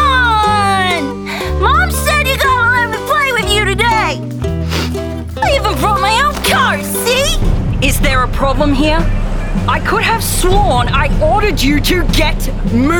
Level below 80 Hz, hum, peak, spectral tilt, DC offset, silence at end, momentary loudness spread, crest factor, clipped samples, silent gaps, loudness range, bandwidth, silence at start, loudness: -18 dBFS; none; -2 dBFS; -4.5 dB/octave; under 0.1%; 0 s; 7 LU; 12 dB; under 0.1%; none; 2 LU; 20 kHz; 0 s; -13 LUFS